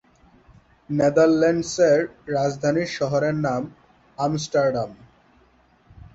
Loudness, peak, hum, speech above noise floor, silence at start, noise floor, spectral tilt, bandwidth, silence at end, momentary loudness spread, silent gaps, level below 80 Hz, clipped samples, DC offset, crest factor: -22 LUFS; -6 dBFS; none; 37 dB; 0.9 s; -58 dBFS; -6 dB/octave; 8 kHz; 1.2 s; 11 LU; none; -56 dBFS; under 0.1%; under 0.1%; 18 dB